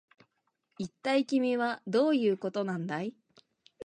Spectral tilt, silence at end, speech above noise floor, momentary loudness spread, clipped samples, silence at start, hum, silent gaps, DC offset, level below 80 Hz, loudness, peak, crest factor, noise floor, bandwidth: -6 dB/octave; 0 s; 49 dB; 12 LU; under 0.1%; 0.8 s; none; none; under 0.1%; -78 dBFS; -30 LUFS; -16 dBFS; 16 dB; -79 dBFS; 9.8 kHz